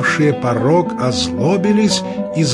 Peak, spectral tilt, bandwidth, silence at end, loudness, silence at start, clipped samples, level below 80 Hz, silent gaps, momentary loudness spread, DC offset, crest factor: -2 dBFS; -5 dB/octave; 11.5 kHz; 0 s; -16 LUFS; 0 s; under 0.1%; -48 dBFS; none; 4 LU; under 0.1%; 12 dB